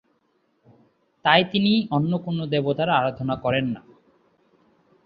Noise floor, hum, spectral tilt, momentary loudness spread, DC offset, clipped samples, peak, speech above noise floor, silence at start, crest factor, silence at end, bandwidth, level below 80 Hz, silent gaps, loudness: -68 dBFS; none; -9 dB/octave; 8 LU; under 0.1%; under 0.1%; -2 dBFS; 46 dB; 1.25 s; 22 dB; 1.25 s; 5.2 kHz; -60 dBFS; none; -22 LUFS